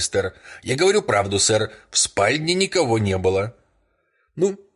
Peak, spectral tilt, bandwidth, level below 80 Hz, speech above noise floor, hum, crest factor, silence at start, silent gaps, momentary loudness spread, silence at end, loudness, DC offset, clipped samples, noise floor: -6 dBFS; -3.5 dB/octave; 11.5 kHz; -46 dBFS; 46 dB; none; 16 dB; 0 s; none; 8 LU; 0.2 s; -20 LUFS; under 0.1%; under 0.1%; -67 dBFS